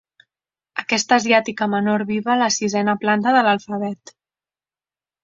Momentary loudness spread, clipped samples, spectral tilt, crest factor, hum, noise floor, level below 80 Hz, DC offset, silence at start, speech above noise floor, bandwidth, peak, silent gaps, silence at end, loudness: 12 LU; under 0.1%; -3.5 dB/octave; 20 dB; none; under -90 dBFS; -64 dBFS; under 0.1%; 0.75 s; over 71 dB; 7.8 kHz; -2 dBFS; none; 1.3 s; -19 LUFS